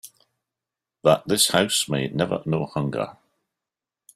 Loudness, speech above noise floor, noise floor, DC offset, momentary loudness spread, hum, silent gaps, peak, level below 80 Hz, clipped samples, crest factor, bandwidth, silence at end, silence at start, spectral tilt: -22 LUFS; 66 dB; -88 dBFS; under 0.1%; 9 LU; none; none; -4 dBFS; -60 dBFS; under 0.1%; 20 dB; 15.5 kHz; 1.05 s; 0.05 s; -3.5 dB/octave